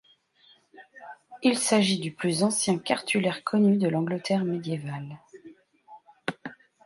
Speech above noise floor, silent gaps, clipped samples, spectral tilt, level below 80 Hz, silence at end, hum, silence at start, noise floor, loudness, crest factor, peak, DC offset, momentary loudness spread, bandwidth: 35 dB; none; under 0.1%; -4.5 dB/octave; -72 dBFS; 0.3 s; none; 0.8 s; -61 dBFS; -26 LUFS; 20 dB; -8 dBFS; under 0.1%; 21 LU; 11.5 kHz